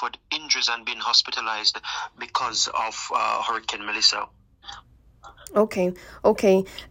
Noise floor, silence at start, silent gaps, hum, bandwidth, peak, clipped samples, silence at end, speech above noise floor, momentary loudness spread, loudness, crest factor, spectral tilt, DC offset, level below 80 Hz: -50 dBFS; 0 s; none; none; 16 kHz; -4 dBFS; under 0.1%; 0 s; 26 dB; 11 LU; -23 LUFS; 20 dB; -2.5 dB/octave; under 0.1%; -56 dBFS